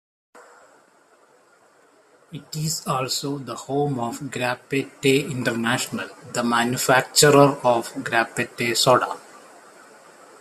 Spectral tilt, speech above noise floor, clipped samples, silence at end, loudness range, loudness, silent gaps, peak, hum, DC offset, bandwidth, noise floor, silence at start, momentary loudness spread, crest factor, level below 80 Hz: -3.5 dB/octave; 35 dB; under 0.1%; 1.05 s; 11 LU; -21 LUFS; none; -2 dBFS; none; under 0.1%; 14.5 kHz; -57 dBFS; 0.35 s; 14 LU; 20 dB; -64 dBFS